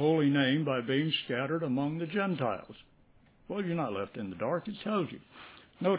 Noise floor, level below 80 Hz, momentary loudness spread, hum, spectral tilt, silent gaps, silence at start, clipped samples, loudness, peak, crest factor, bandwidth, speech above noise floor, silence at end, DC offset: -62 dBFS; -68 dBFS; 14 LU; none; -4.5 dB/octave; none; 0 s; under 0.1%; -32 LUFS; -14 dBFS; 18 dB; 4 kHz; 31 dB; 0 s; under 0.1%